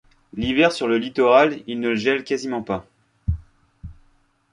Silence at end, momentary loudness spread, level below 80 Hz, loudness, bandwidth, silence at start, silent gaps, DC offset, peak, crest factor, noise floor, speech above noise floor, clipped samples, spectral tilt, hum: 0.6 s; 14 LU; -40 dBFS; -21 LUFS; 11 kHz; 0.35 s; none; under 0.1%; -2 dBFS; 20 dB; -60 dBFS; 40 dB; under 0.1%; -5.5 dB/octave; none